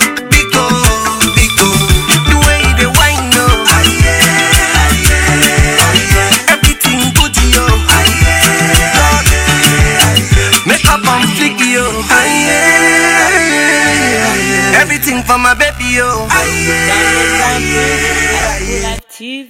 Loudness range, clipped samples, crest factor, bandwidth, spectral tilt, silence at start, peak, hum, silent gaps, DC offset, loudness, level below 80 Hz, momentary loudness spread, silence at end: 2 LU; 1%; 10 dB; over 20 kHz; -3 dB/octave; 0 s; 0 dBFS; none; none; under 0.1%; -8 LUFS; -18 dBFS; 4 LU; 0.05 s